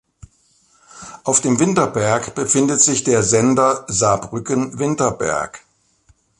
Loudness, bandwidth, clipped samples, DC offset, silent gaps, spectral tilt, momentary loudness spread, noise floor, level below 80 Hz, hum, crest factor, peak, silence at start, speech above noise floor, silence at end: -17 LUFS; 11.5 kHz; under 0.1%; under 0.1%; none; -4 dB/octave; 9 LU; -58 dBFS; -50 dBFS; none; 18 dB; 0 dBFS; 0.95 s; 41 dB; 0.8 s